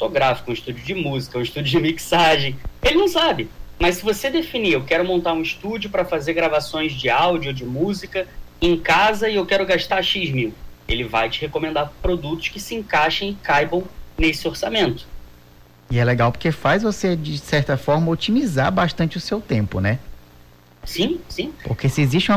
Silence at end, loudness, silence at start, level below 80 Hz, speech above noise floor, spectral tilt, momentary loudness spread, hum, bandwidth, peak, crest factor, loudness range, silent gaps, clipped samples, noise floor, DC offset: 0 s; -20 LUFS; 0 s; -38 dBFS; 28 dB; -5.5 dB/octave; 9 LU; 60 Hz at -40 dBFS; 16 kHz; -8 dBFS; 12 dB; 3 LU; none; under 0.1%; -48 dBFS; under 0.1%